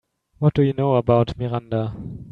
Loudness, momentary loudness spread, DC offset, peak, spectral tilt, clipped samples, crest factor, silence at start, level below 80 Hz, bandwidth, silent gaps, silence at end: -21 LUFS; 10 LU; under 0.1%; -2 dBFS; -10 dB/octave; under 0.1%; 18 dB; 0.4 s; -46 dBFS; 5.6 kHz; none; 0 s